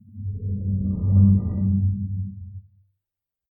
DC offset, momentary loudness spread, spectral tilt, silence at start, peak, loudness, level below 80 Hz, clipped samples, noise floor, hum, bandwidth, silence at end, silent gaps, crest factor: under 0.1%; 17 LU; -17 dB/octave; 0.15 s; -6 dBFS; -22 LUFS; -40 dBFS; under 0.1%; -87 dBFS; none; 1.3 kHz; 0.9 s; none; 18 dB